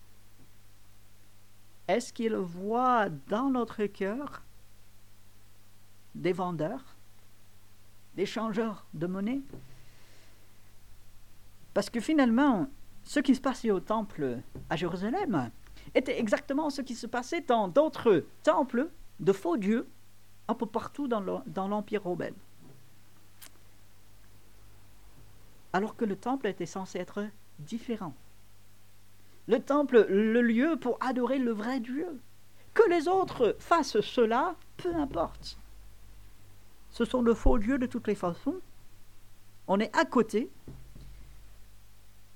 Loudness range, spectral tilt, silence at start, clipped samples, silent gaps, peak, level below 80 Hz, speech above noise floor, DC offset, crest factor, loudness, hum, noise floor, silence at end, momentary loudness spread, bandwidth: 10 LU; -6 dB/octave; 1.9 s; under 0.1%; none; -8 dBFS; -46 dBFS; 31 dB; 0.4%; 22 dB; -30 LUFS; 50 Hz at -60 dBFS; -60 dBFS; 0.7 s; 15 LU; 18.5 kHz